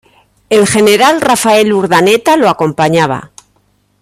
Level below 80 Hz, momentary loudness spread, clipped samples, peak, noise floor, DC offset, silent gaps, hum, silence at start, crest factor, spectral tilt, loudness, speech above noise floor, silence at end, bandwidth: -48 dBFS; 5 LU; under 0.1%; 0 dBFS; -55 dBFS; under 0.1%; none; 50 Hz at -35 dBFS; 0.5 s; 10 dB; -4 dB/octave; -9 LUFS; 46 dB; 0.75 s; 16 kHz